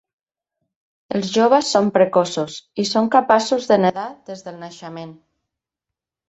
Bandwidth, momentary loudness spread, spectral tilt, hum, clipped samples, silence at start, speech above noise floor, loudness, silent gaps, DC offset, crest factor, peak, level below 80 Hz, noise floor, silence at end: 8.4 kHz; 19 LU; -4.5 dB/octave; none; under 0.1%; 1.1 s; 67 dB; -17 LUFS; none; under 0.1%; 18 dB; -2 dBFS; -64 dBFS; -86 dBFS; 1.15 s